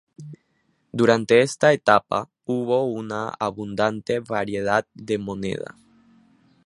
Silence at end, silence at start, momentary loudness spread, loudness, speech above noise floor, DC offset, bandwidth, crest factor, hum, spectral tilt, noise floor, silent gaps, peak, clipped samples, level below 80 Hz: 1.05 s; 0.2 s; 15 LU; -22 LUFS; 35 dB; under 0.1%; 11.5 kHz; 22 dB; none; -5.5 dB/octave; -58 dBFS; none; -2 dBFS; under 0.1%; -60 dBFS